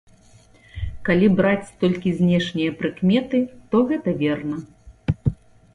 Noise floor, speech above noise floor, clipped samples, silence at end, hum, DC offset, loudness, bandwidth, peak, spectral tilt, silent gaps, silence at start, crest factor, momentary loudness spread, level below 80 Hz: -51 dBFS; 31 dB; under 0.1%; 0.4 s; none; under 0.1%; -21 LUFS; 10.5 kHz; -6 dBFS; -8 dB/octave; none; 0.75 s; 16 dB; 13 LU; -42 dBFS